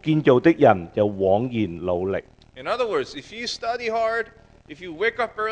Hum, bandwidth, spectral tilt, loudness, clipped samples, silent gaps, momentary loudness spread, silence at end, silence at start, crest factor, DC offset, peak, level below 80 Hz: none; 9.4 kHz; -6.5 dB/octave; -22 LUFS; under 0.1%; none; 14 LU; 0 s; 0 s; 22 dB; under 0.1%; 0 dBFS; -54 dBFS